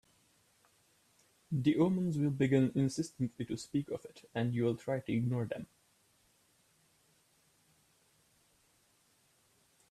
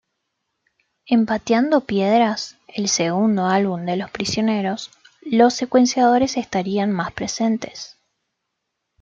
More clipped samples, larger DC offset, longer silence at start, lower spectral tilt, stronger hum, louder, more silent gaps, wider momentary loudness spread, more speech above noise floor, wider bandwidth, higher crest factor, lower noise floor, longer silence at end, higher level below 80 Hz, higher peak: neither; neither; first, 1.5 s vs 1.1 s; first, -7.5 dB/octave vs -4.5 dB/octave; neither; second, -34 LUFS vs -19 LUFS; neither; about the same, 12 LU vs 12 LU; second, 38 dB vs 59 dB; first, 13.5 kHz vs 7.8 kHz; about the same, 20 dB vs 18 dB; second, -71 dBFS vs -78 dBFS; first, 4.25 s vs 1.15 s; second, -70 dBFS vs -58 dBFS; second, -16 dBFS vs -2 dBFS